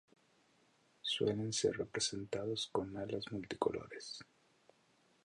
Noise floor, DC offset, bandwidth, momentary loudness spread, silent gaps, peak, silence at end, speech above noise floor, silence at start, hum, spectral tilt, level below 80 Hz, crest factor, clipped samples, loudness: -73 dBFS; under 0.1%; 11.5 kHz; 11 LU; none; -18 dBFS; 1 s; 33 dB; 1.05 s; none; -3.5 dB/octave; -70 dBFS; 24 dB; under 0.1%; -39 LUFS